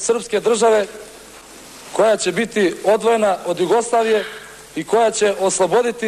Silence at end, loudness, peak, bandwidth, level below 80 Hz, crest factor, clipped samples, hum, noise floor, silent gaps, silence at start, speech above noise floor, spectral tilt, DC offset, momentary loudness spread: 0 s; -17 LUFS; -6 dBFS; 13.5 kHz; -58 dBFS; 12 dB; under 0.1%; none; -40 dBFS; none; 0 s; 23 dB; -3.5 dB/octave; under 0.1%; 18 LU